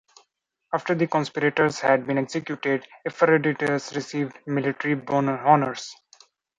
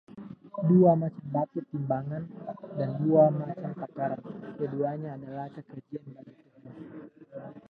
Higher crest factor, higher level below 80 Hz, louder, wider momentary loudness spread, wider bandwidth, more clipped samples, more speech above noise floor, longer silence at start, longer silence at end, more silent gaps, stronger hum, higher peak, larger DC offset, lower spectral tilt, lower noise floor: about the same, 20 dB vs 20 dB; about the same, -68 dBFS vs -70 dBFS; first, -24 LUFS vs -28 LUFS; second, 10 LU vs 24 LU; first, 10 kHz vs 4.3 kHz; neither; first, 48 dB vs 22 dB; first, 0.7 s vs 0.1 s; first, 0.65 s vs 0.1 s; neither; neither; first, -4 dBFS vs -10 dBFS; neither; second, -6 dB/octave vs -12.5 dB/octave; first, -72 dBFS vs -50 dBFS